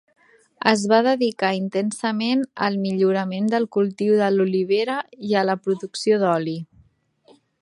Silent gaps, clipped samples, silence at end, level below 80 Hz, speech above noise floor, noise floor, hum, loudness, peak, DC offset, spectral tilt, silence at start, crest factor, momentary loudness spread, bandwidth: none; under 0.1%; 0.95 s; -70 dBFS; 38 dB; -58 dBFS; none; -21 LUFS; 0 dBFS; under 0.1%; -5.5 dB/octave; 0.65 s; 20 dB; 7 LU; 11.5 kHz